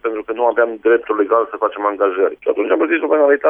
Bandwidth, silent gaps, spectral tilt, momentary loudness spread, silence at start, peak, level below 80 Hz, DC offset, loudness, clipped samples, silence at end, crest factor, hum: 3.6 kHz; none; -7 dB/octave; 4 LU; 0.05 s; -2 dBFS; -62 dBFS; under 0.1%; -16 LUFS; under 0.1%; 0 s; 12 dB; none